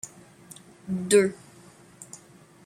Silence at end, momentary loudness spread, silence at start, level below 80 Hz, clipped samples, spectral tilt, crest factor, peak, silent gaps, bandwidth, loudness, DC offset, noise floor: 0.6 s; 26 LU; 0.05 s; -70 dBFS; under 0.1%; -4.5 dB/octave; 22 dB; -8 dBFS; none; 15.5 kHz; -24 LUFS; under 0.1%; -53 dBFS